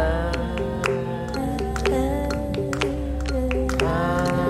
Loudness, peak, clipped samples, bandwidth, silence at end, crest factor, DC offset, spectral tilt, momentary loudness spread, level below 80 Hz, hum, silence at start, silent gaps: -24 LUFS; -4 dBFS; under 0.1%; 14 kHz; 0 s; 18 dB; under 0.1%; -6 dB/octave; 5 LU; -30 dBFS; none; 0 s; none